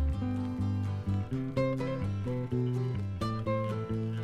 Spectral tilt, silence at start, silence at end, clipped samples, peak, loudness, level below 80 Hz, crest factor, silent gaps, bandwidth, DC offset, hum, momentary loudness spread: -8.5 dB/octave; 0 s; 0 s; under 0.1%; -18 dBFS; -33 LUFS; -44 dBFS; 14 dB; none; 9.6 kHz; under 0.1%; none; 3 LU